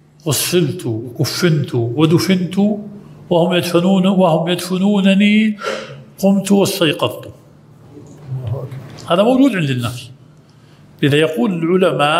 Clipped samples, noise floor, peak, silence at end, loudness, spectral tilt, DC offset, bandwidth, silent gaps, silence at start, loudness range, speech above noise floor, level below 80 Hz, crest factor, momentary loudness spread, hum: under 0.1%; -45 dBFS; 0 dBFS; 0 s; -15 LUFS; -5.5 dB/octave; under 0.1%; 16 kHz; none; 0.25 s; 5 LU; 31 dB; -56 dBFS; 16 dB; 13 LU; none